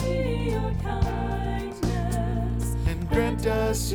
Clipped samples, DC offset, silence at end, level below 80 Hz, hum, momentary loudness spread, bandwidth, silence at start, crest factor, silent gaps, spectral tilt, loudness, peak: under 0.1%; under 0.1%; 0 s; -30 dBFS; none; 4 LU; 18.5 kHz; 0 s; 16 dB; none; -6 dB/octave; -27 LUFS; -10 dBFS